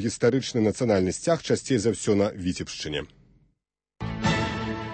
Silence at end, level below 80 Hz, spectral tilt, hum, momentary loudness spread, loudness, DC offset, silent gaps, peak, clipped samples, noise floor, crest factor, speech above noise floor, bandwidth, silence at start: 0 s; -48 dBFS; -5 dB/octave; none; 9 LU; -26 LUFS; under 0.1%; none; -8 dBFS; under 0.1%; -74 dBFS; 18 dB; 49 dB; 8.8 kHz; 0 s